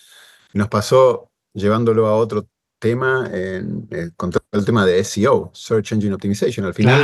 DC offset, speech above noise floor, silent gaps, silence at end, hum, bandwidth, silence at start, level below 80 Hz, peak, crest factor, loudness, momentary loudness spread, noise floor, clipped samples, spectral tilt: under 0.1%; 31 dB; none; 0 s; none; 12.5 kHz; 0.55 s; -54 dBFS; -2 dBFS; 16 dB; -18 LUFS; 12 LU; -48 dBFS; under 0.1%; -6 dB/octave